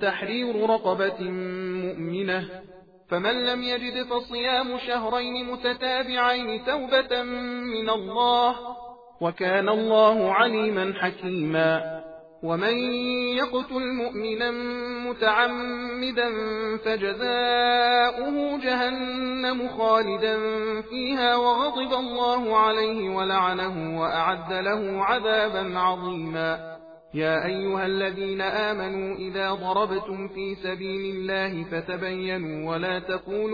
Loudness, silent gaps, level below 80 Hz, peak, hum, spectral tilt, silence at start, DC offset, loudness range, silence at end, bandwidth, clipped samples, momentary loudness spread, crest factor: -25 LUFS; none; -58 dBFS; -6 dBFS; none; -6.5 dB/octave; 0 s; under 0.1%; 5 LU; 0 s; 5 kHz; under 0.1%; 9 LU; 18 dB